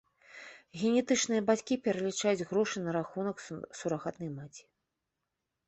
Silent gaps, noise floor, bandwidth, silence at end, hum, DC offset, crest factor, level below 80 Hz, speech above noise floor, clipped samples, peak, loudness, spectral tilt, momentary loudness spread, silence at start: none; -86 dBFS; 8.4 kHz; 1.05 s; none; under 0.1%; 18 dB; -72 dBFS; 54 dB; under 0.1%; -14 dBFS; -32 LUFS; -4.5 dB/octave; 18 LU; 0.35 s